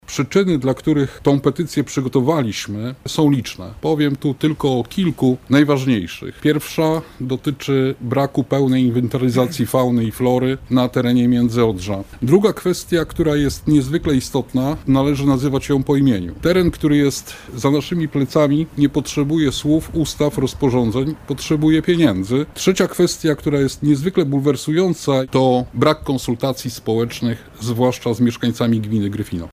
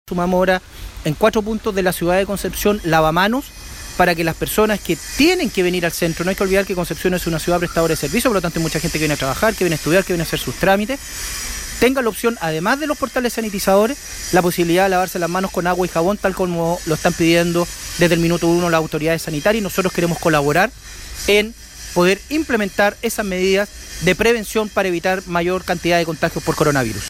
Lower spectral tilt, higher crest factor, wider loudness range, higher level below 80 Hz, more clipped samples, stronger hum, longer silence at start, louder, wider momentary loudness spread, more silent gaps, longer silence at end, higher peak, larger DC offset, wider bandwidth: first, -6.5 dB/octave vs -4.5 dB/octave; about the same, 16 dB vs 16 dB; about the same, 2 LU vs 1 LU; about the same, -40 dBFS vs -36 dBFS; neither; neither; about the same, 0.1 s vs 0.05 s; about the same, -18 LUFS vs -18 LUFS; about the same, 6 LU vs 6 LU; neither; about the same, 0.05 s vs 0 s; about the same, -2 dBFS vs -2 dBFS; neither; about the same, 16 kHz vs 16.5 kHz